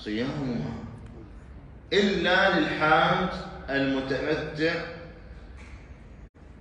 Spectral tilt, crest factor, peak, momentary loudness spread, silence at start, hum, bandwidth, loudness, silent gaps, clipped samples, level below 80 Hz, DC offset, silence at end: -5.5 dB/octave; 20 dB; -8 dBFS; 25 LU; 0 s; none; 10 kHz; -25 LUFS; 6.29-6.34 s; under 0.1%; -48 dBFS; under 0.1%; 0 s